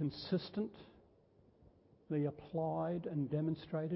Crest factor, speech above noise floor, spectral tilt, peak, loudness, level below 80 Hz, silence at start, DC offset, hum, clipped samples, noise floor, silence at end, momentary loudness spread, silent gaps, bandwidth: 16 dB; 29 dB; -7.5 dB/octave; -24 dBFS; -40 LUFS; -70 dBFS; 0 s; under 0.1%; none; under 0.1%; -68 dBFS; 0 s; 5 LU; none; 5.6 kHz